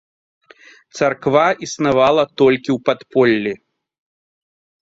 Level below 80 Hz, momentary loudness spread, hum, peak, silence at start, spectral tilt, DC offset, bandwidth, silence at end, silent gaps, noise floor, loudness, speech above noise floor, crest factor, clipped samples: -56 dBFS; 7 LU; none; -2 dBFS; 0.95 s; -5 dB/octave; under 0.1%; 7.8 kHz; 1.3 s; none; -47 dBFS; -16 LUFS; 31 dB; 16 dB; under 0.1%